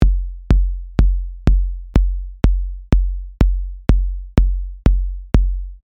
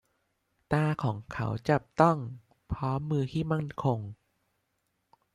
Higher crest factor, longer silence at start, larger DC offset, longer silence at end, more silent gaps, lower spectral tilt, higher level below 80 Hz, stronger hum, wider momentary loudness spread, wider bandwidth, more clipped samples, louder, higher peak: second, 16 dB vs 24 dB; second, 0 s vs 0.7 s; neither; second, 0.1 s vs 1.2 s; neither; about the same, -8.5 dB/octave vs -8 dB/octave; first, -16 dBFS vs -54 dBFS; neither; second, 4 LU vs 12 LU; second, 5.8 kHz vs 10.5 kHz; neither; first, -20 LUFS vs -30 LUFS; first, 0 dBFS vs -8 dBFS